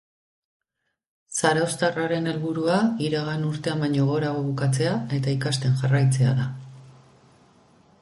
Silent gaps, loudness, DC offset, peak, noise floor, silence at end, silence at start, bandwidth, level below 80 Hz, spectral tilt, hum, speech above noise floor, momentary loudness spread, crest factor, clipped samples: none; -24 LUFS; under 0.1%; -6 dBFS; -79 dBFS; 1.1 s; 1.3 s; 11.5 kHz; -60 dBFS; -6 dB/octave; none; 56 dB; 6 LU; 18 dB; under 0.1%